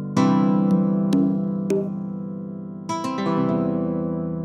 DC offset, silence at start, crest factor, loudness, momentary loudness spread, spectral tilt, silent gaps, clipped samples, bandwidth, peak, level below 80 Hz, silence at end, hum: under 0.1%; 0 s; 16 dB; -22 LUFS; 12 LU; -8 dB/octave; none; under 0.1%; 9.6 kHz; -6 dBFS; -58 dBFS; 0 s; 50 Hz at -60 dBFS